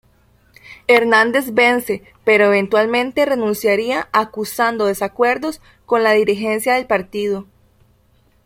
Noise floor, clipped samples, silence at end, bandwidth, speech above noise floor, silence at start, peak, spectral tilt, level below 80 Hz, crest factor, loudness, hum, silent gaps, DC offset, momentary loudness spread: -56 dBFS; under 0.1%; 1.05 s; 16.5 kHz; 40 dB; 0.65 s; 0 dBFS; -4 dB/octave; -56 dBFS; 16 dB; -16 LUFS; none; none; under 0.1%; 9 LU